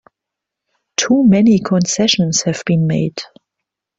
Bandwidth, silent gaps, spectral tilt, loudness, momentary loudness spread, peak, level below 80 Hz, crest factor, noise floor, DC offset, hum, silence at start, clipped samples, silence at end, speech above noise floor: 8 kHz; none; -4.5 dB/octave; -14 LUFS; 12 LU; -2 dBFS; -54 dBFS; 14 dB; -82 dBFS; under 0.1%; none; 1 s; under 0.1%; 0.75 s; 68 dB